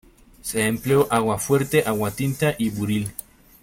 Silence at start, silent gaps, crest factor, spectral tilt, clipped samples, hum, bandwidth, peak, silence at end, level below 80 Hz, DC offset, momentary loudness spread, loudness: 0.45 s; none; 18 dB; -5.5 dB/octave; under 0.1%; none; 17 kHz; -6 dBFS; 0.4 s; -50 dBFS; under 0.1%; 9 LU; -22 LUFS